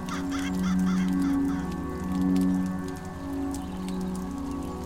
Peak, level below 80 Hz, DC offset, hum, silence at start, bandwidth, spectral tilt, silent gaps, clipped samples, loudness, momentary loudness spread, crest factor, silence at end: -16 dBFS; -44 dBFS; under 0.1%; none; 0 s; 15.5 kHz; -6.5 dB/octave; none; under 0.1%; -29 LUFS; 9 LU; 12 dB; 0 s